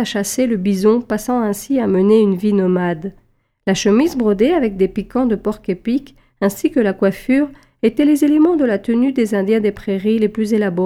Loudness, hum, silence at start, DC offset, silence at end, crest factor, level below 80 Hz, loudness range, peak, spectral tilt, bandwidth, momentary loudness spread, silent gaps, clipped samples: -16 LUFS; none; 0 s; under 0.1%; 0 s; 14 dB; -46 dBFS; 2 LU; -2 dBFS; -6 dB/octave; 16 kHz; 8 LU; none; under 0.1%